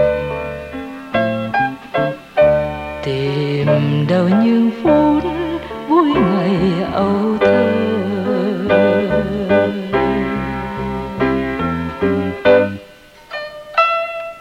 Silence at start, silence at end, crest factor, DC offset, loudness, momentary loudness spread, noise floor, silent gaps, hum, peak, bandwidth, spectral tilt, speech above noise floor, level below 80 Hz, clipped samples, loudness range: 0 s; 0 s; 14 dB; under 0.1%; -16 LUFS; 10 LU; -41 dBFS; none; none; -2 dBFS; 13 kHz; -8 dB/octave; 28 dB; -40 dBFS; under 0.1%; 3 LU